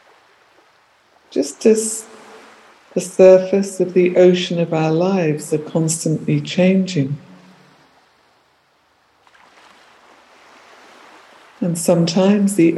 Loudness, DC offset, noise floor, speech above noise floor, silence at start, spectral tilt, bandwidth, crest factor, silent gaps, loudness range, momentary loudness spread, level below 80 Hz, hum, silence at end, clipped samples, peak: -16 LUFS; under 0.1%; -58 dBFS; 43 dB; 1.3 s; -6 dB/octave; 12.5 kHz; 18 dB; none; 9 LU; 13 LU; -68 dBFS; none; 0 s; under 0.1%; 0 dBFS